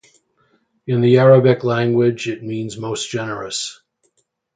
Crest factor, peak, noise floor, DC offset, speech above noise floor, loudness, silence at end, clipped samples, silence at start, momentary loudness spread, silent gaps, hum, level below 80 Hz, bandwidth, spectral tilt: 18 dB; 0 dBFS; -66 dBFS; under 0.1%; 50 dB; -17 LUFS; 0.85 s; under 0.1%; 0.85 s; 15 LU; none; none; -60 dBFS; 9.4 kHz; -6 dB/octave